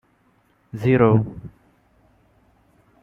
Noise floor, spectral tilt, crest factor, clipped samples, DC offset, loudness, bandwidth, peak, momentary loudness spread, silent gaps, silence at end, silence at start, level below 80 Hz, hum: -61 dBFS; -10 dB/octave; 20 dB; under 0.1%; under 0.1%; -19 LUFS; 5.4 kHz; -4 dBFS; 24 LU; none; 1.55 s; 0.75 s; -52 dBFS; none